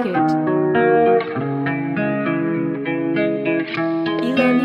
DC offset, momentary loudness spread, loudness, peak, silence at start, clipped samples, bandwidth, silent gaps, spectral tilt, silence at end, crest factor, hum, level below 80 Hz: under 0.1%; 7 LU; -19 LUFS; -4 dBFS; 0 s; under 0.1%; 6.4 kHz; none; -8.5 dB/octave; 0 s; 14 dB; none; -62 dBFS